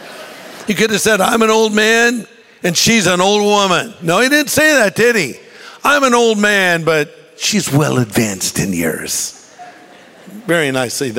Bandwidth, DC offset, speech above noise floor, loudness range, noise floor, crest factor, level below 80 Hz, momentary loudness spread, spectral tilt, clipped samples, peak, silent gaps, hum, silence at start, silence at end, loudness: 16.5 kHz; under 0.1%; 27 dB; 5 LU; -40 dBFS; 14 dB; -50 dBFS; 11 LU; -3.5 dB/octave; under 0.1%; 0 dBFS; none; none; 0 s; 0 s; -13 LUFS